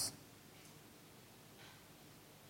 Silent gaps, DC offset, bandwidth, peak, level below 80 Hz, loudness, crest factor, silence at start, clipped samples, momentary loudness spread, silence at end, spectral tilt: none; under 0.1%; 16.5 kHz; -28 dBFS; -78 dBFS; -54 LUFS; 26 dB; 0 s; under 0.1%; 2 LU; 0 s; -1.5 dB/octave